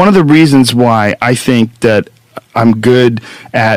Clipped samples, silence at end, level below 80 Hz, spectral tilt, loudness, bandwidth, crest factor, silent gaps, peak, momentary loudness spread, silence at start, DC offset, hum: 4%; 0 s; -44 dBFS; -6 dB/octave; -9 LUFS; 15.5 kHz; 8 dB; none; 0 dBFS; 11 LU; 0 s; under 0.1%; none